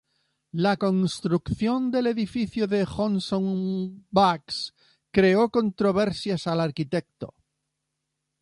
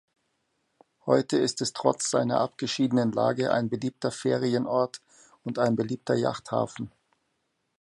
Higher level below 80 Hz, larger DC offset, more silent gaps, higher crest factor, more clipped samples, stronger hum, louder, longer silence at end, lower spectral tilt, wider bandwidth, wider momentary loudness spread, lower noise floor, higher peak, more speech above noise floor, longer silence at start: first, -54 dBFS vs -68 dBFS; neither; neither; about the same, 20 dB vs 22 dB; neither; neither; about the same, -25 LUFS vs -27 LUFS; first, 1.1 s vs 0.9 s; first, -6.5 dB/octave vs -5 dB/octave; about the same, 11.5 kHz vs 11.5 kHz; about the same, 10 LU vs 9 LU; first, -81 dBFS vs -77 dBFS; about the same, -6 dBFS vs -6 dBFS; first, 57 dB vs 50 dB; second, 0.55 s vs 1.05 s